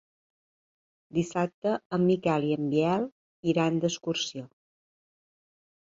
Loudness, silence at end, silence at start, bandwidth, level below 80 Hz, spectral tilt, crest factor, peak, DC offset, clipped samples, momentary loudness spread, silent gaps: -28 LUFS; 1.45 s; 1.15 s; 7.8 kHz; -68 dBFS; -6 dB/octave; 18 dB; -12 dBFS; under 0.1%; under 0.1%; 8 LU; 1.54-1.62 s, 1.86-1.90 s, 3.12-3.43 s